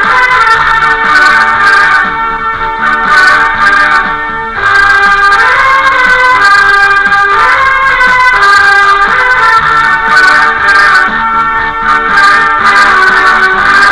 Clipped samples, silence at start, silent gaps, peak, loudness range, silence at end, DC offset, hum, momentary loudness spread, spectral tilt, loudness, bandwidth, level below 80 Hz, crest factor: 5%; 0 s; none; 0 dBFS; 2 LU; 0 s; 0.4%; none; 5 LU; -2 dB/octave; -5 LUFS; 11 kHz; -30 dBFS; 6 dB